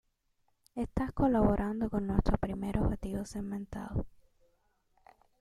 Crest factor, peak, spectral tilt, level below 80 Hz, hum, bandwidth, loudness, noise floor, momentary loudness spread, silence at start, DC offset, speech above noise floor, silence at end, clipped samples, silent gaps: 24 dB; -10 dBFS; -8.5 dB/octave; -42 dBFS; none; 13.5 kHz; -33 LUFS; -75 dBFS; 12 LU; 0.75 s; under 0.1%; 44 dB; 1.3 s; under 0.1%; none